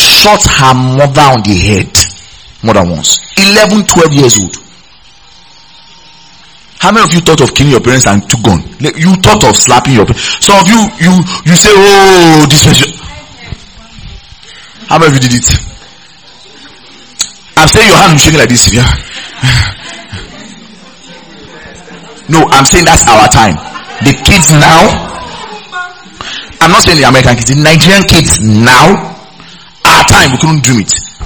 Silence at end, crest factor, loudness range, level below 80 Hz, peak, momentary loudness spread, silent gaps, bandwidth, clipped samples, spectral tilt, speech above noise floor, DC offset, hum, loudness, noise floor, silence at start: 0 s; 6 dB; 7 LU; -24 dBFS; 0 dBFS; 18 LU; none; over 20 kHz; 10%; -3.5 dB/octave; 34 dB; 0.9%; none; -4 LUFS; -38 dBFS; 0 s